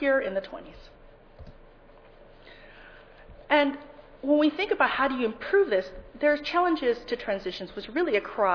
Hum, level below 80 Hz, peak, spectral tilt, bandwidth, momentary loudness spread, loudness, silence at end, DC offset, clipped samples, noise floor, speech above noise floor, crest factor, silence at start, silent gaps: none; -54 dBFS; -8 dBFS; -5.5 dB/octave; 5.4 kHz; 13 LU; -26 LUFS; 0 s; under 0.1%; under 0.1%; -52 dBFS; 26 dB; 20 dB; 0 s; none